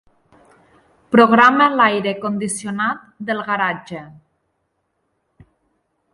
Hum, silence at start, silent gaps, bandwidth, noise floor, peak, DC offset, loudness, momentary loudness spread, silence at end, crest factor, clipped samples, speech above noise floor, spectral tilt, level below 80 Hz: none; 1.1 s; none; 11.5 kHz; -70 dBFS; 0 dBFS; under 0.1%; -16 LUFS; 17 LU; 2.05 s; 20 dB; under 0.1%; 54 dB; -4.5 dB/octave; -64 dBFS